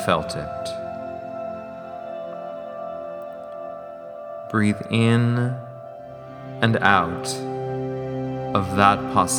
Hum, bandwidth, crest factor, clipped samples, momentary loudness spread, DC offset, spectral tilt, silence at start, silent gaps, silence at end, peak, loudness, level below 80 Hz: none; 18.5 kHz; 24 dB; under 0.1%; 19 LU; under 0.1%; -5 dB/octave; 0 s; none; 0 s; 0 dBFS; -23 LUFS; -54 dBFS